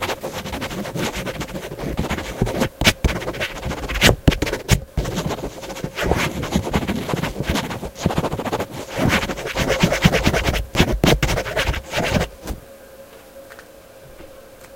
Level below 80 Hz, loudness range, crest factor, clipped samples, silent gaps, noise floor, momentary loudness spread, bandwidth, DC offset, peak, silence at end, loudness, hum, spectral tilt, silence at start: -30 dBFS; 4 LU; 22 dB; under 0.1%; none; -43 dBFS; 18 LU; 17 kHz; under 0.1%; 0 dBFS; 0 s; -21 LUFS; none; -4.5 dB/octave; 0 s